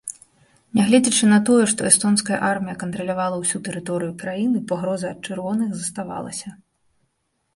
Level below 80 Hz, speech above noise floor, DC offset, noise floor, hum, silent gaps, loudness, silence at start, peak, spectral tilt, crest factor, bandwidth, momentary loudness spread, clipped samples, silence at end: -60 dBFS; 51 dB; under 0.1%; -72 dBFS; none; none; -20 LUFS; 0.05 s; 0 dBFS; -4 dB/octave; 22 dB; 11.5 kHz; 14 LU; under 0.1%; 1 s